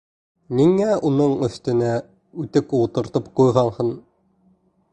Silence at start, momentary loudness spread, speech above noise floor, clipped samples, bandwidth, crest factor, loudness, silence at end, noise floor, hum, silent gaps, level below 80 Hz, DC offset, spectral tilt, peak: 0.5 s; 10 LU; 41 dB; under 0.1%; 9 kHz; 18 dB; -20 LUFS; 0.95 s; -60 dBFS; none; none; -54 dBFS; under 0.1%; -8 dB/octave; -2 dBFS